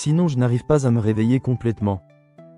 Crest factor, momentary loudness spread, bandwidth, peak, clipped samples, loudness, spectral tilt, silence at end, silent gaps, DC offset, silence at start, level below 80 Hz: 14 dB; 6 LU; 11 kHz; -6 dBFS; under 0.1%; -20 LUFS; -8 dB/octave; 0.15 s; none; under 0.1%; 0 s; -48 dBFS